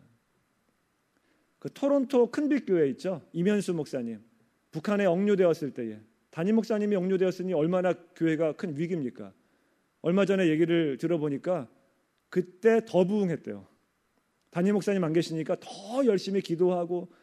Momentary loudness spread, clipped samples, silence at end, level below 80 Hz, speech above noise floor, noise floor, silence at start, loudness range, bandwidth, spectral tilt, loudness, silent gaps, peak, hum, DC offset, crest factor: 13 LU; under 0.1%; 0.15 s; -78 dBFS; 46 dB; -73 dBFS; 1.65 s; 2 LU; 13 kHz; -7 dB/octave; -28 LUFS; none; -10 dBFS; none; under 0.1%; 18 dB